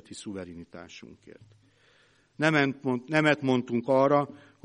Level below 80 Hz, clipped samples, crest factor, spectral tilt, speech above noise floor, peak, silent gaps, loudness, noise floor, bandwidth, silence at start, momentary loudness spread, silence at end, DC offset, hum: -68 dBFS; under 0.1%; 22 dB; -6 dB/octave; 36 dB; -8 dBFS; none; -26 LUFS; -64 dBFS; 10.5 kHz; 0.1 s; 22 LU; 0.3 s; under 0.1%; none